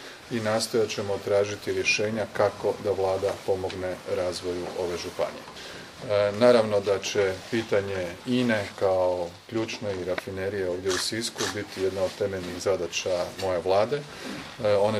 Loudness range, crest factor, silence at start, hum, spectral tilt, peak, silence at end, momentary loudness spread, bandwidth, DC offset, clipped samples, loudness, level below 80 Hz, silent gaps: 4 LU; 22 dB; 0 s; none; -4 dB/octave; -6 dBFS; 0 s; 8 LU; 15.5 kHz; under 0.1%; under 0.1%; -27 LUFS; -62 dBFS; none